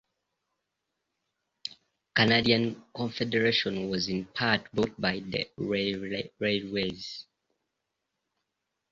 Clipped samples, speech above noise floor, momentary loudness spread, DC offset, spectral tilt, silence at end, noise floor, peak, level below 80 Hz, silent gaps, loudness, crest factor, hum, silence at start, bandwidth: under 0.1%; 55 dB; 16 LU; under 0.1%; -5 dB/octave; 1.7 s; -84 dBFS; -8 dBFS; -60 dBFS; none; -28 LUFS; 22 dB; none; 1.65 s; 7.6 kHz